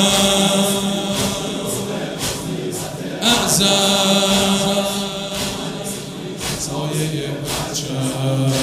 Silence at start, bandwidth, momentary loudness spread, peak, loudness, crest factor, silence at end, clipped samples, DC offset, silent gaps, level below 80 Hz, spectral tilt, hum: 0 s; 16 kHz; 12 LU; 0 dBFS; -18 LUFS; 18 dB; 0 s; under 0.1%; under 0.1%; none; -44 dBFS; -3.5 dB/octave; none